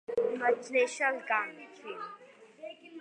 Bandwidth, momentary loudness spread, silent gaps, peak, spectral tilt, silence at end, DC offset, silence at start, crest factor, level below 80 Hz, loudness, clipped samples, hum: 10 kHz; 19 LU; none; -14 dBFS; -2.5 dB/octave; 0 s; under 0.1%; 0.1 s; 18 dB; -80 dBFS; -31 LUFS; under 0.1%; none